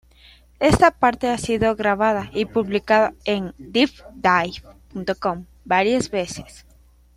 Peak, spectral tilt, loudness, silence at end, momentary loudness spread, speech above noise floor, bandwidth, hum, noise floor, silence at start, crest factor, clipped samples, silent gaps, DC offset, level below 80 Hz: -2 dBFS; -5 dB/octave; -20 LUFS; 0.7 s; 13 LU; 32 dB; 15.5 kHz; none; -52 dBFS; 0.6 s; 18 dB; under 0.1%; none; under 0.1%; -44 dBFS